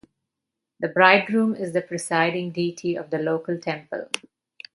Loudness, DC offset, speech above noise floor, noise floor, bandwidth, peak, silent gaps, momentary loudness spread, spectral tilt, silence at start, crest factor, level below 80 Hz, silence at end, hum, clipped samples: -23 LUFS; under 0.1%; 61 dB; -84 dBFS; 11.5 kHz; 0 dBFS; none; 14 LU; -4.5 dB/octave; 0.8 s; 24 dB; -72 dBFS; 0.55 s; none; under 0.1%